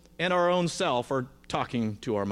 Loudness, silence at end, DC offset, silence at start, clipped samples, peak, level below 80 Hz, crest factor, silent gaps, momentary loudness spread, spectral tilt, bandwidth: -28 LUFS; 0 s; under 0.1%; 0.2 s; under 0.1%; -14 dBFS; -58 dBFS; 14 dB; none; 8 LU; -5 dB/octave; 13.5 kHz